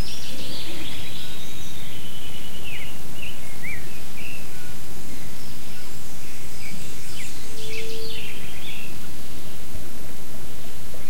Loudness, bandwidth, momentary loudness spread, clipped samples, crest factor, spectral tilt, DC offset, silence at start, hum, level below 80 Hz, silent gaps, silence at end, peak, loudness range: -36 LUFS; 16.5 kHz; 6 LU; under 0.1%; 16 dB; -3.5 dB/octave; 30%; 0 s; none; -48 dBFS; none; 0 s; -10 dBFS; 2 LU